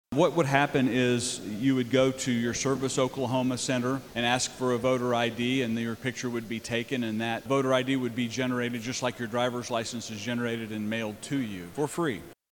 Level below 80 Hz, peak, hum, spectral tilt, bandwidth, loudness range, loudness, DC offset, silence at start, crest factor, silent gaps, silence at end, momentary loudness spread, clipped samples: -62 dBFS; -6 dBFS; none; -4.5 dB/octave; 19 kHz; 5 LU; -28 LUFS; under 0.1%; 0.1 s; 22 dB; none; 0.2 s; 7 LU; under 0.1%